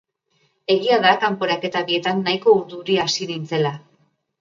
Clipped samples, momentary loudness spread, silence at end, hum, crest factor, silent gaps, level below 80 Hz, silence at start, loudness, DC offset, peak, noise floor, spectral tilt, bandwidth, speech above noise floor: under 0.1%; 9 LU; 0.6 s; none; 20 dB; none; -66 dBFS; 0.7 s; -19 LUFS; under 0.1%; -2 dBFS; -66 dBFS; -4.5 dB/octave; 7.6 kHz; 46 dB